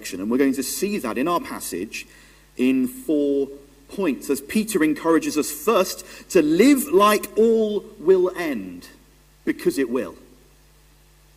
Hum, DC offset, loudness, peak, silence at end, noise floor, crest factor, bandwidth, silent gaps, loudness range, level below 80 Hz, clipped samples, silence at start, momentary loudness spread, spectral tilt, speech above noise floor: none; under 0.1%; -21 LUFS; -4 dBFS; 1.2 s; -53 dBFS; 18 dB; 16 kHz; none; 6 LU; -56 dBFS; under 0.1%; 0 s; 14 LU; -4.5 dB/octave; 32 dB